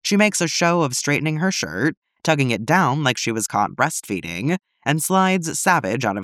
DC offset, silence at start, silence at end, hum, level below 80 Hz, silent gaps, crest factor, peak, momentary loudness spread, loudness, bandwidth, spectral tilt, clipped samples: under 0.1%; 0.05 s; 0 s; none; -62 dBFS; 1.97-2.02 s; 18 dB; -2 dBFS; 7 LU; -20 LUFS; 16 kHz; -4 dB/octave; under 0.1%